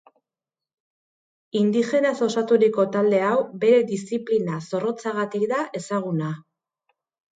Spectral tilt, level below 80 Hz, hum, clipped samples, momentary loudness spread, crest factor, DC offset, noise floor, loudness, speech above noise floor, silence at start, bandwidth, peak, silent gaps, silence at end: -6.5 dB/octave; -72 dBFS; none; under 0.1%; 9 LU; 16 dB; under 0.1%; -90 dBFS; -22 LUFS; 68 dB; 1.55 s; 9.2 kHz; -6 dBFS; none; 0.95 s